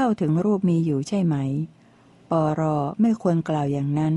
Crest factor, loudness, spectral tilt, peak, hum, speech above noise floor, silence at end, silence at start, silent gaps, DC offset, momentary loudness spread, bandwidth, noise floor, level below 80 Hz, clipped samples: 12 dB; -23 LUFS; -8.5 dB/octave; -10 dBFS; none; 31 dB; 0 s; 0 s; none; under 0.1%; 5 LU; 11 kHz; -53 dBFS; -60 dBFS; under 0.1%